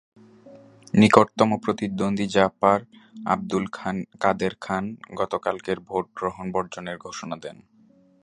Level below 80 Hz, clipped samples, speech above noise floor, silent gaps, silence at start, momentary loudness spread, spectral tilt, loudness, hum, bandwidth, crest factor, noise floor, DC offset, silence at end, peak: -58 dBFS; under 0.1%; 33 dB; none; 0.45 s; 16 LU; -6 dB/octave; -24 LUFS; none; 11 kHz; 24 dB; -57 dBFS; under 0.1%; 0.7 s; 0 dBFS